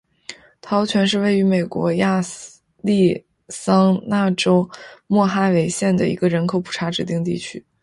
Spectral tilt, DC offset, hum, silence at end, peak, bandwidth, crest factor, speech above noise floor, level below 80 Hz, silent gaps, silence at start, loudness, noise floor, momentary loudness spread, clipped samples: -6 dB/octave; under 0.1%; none; 0.25 s; -4 dBFS; 11.5 kHz; 14 dB; 23 dB; -56 dBFS; none; 0.3 s; -19 LUFS; -41 dBFS; 13 LU; under 0.1%